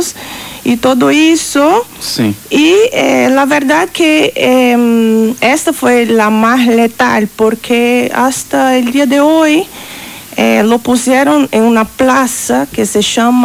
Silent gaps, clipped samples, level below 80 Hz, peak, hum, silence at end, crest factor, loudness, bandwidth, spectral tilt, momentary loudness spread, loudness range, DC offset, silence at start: none; under 0.1%; -46 dBFS; 0 dBFS; none; 0 s; 10 dB; -9 LUFS; over 20 kHz; -3.5 dB/octave; 6 LU; 2 LU; under 0.1%; 0 s